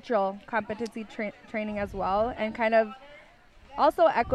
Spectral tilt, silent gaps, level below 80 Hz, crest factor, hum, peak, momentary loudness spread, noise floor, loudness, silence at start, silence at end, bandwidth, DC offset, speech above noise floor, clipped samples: -6 dB/octave; none; -52 dBFS; 18 dB; none; -10 dBFS; 12 LU; -54 dBFS; -28 LUFS; 0.05 s; 0 s; 12.5 kHz; under 0.1%; 27 dB; under 0.1%